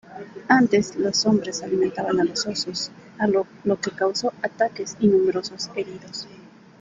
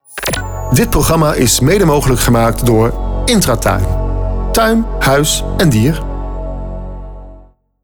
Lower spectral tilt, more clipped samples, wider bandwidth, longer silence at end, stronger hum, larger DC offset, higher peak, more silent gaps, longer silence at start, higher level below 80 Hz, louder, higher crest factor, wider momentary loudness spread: about the same, -4 dB/octave vs -5 dB/octave; neither; second, 9.4 kHz vs over 20 kHz; about the same, 0.4 s vs 0.45 s; neither; second, under 0.1% vs 0.5%; about the same, -4 dBFS vs -2 dBFS; neither; about the same, 0.1 s vs 0.1 s; second, -62 dBFS vs -20 dBFS; second, -23 LUFS vs -13 LUFS; first, 20 dB vs 10 dB; about the same, 14 LU vs 14 LU